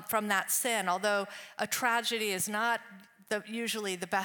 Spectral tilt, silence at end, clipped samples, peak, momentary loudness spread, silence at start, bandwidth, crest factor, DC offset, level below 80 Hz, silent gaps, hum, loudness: -2 dB/octave; 0 s; under 0.1%; -14 dBFS; 8 LU; 0 s; 19 kHz; 18 dB; under 0.1%; -80 dBFS; none; none; -31 LUFS